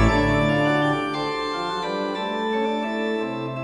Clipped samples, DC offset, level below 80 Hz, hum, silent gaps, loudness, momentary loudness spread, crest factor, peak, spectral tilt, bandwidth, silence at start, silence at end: under 0.1%; under 0.1%; -36 dBFS; none; none; -23 LUFS; 6 LU; 16 dB; -6 dBFS; -6 dB/octave; 11 kHz; 0 s; 0 s